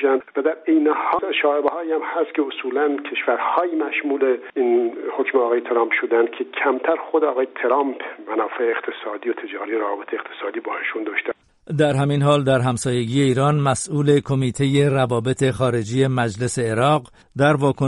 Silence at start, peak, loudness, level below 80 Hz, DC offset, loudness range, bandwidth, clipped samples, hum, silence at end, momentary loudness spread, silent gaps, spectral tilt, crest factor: 0 s; -4 dBFS; -20 LUFS; -56 dBFS; under 0.1%; 5 LU; 11.5 kHz; under 0.1%; none; 0 s; 8 LU; none; -6 dB/octave; 16 dB